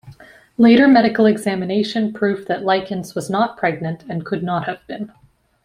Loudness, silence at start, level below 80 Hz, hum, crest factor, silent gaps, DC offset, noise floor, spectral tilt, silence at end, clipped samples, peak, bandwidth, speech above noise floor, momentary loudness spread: -17 LUFS; 0.05 s; -58 dBFS; none; 16 dB; none; under 0.1%; -43 dBFS; -6.5 dB/octave; 0.55 s; under 0.1%; -2 dBFS; 12 kHz; 26 dB; 16 LU